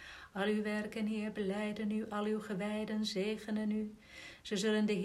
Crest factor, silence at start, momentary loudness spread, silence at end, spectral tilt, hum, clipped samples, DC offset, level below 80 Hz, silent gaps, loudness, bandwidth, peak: 14 dB; 0 s; 8 LU; 0 s; -5.5 dB/octave; none; under 0.1%; under 0.1%; -68 dBFS; none; -37 LUFS; 13 kHz; -24 dBFS